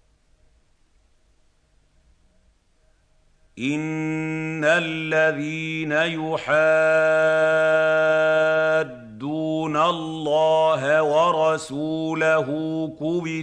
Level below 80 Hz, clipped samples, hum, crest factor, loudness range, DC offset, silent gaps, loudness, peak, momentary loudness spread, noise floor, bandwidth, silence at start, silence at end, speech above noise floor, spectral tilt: -62 dBFS; under 0.1%; none; 16 dB; 10 LU; under 0.1%; none; -21 LUFS; -6 dBFS; 9 LU; -61 dBFS; 10 kHz; 3.55 s; 0 s; 41 dB; -5.5 dB/octave